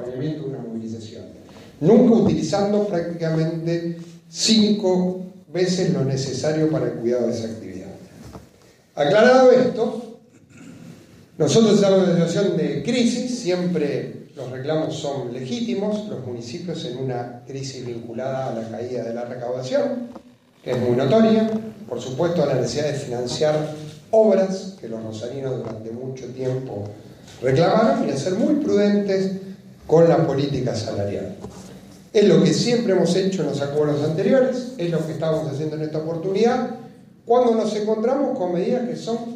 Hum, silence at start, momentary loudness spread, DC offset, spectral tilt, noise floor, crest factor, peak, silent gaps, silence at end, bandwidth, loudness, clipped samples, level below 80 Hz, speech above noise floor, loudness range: none; 0 s; 17 LU; under 0.1%; -6 dB/octave; -52 dBFS; 18 dB; -2 dBFS; none; 0 s; 11.5 kHz; -21 LUFS; under 0.1%; -58 dBFS; 32 dB; 8 LU